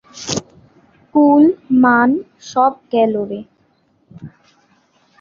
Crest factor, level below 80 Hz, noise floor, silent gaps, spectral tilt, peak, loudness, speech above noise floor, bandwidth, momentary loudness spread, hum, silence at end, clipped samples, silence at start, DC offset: 16 dB; -58 dBFS; -59 dBFS; none; -5 dB/octave; -2 dBFS; -15 LUFS; 45 dB; 7.6 kHz; 12 LU; none; 0.9 s; under 0.1%; 0.15 s; under 0.1%